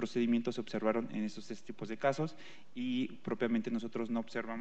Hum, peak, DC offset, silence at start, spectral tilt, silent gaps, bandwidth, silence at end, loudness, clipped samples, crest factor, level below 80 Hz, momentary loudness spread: none; -18 dBFS; 0.5%; 0 s; -6.5 dB/octave; none; 8.4 kHz; 0 s; -36 LUFS; under 0.1%; 18 dB; -82 dBFS; 12 LU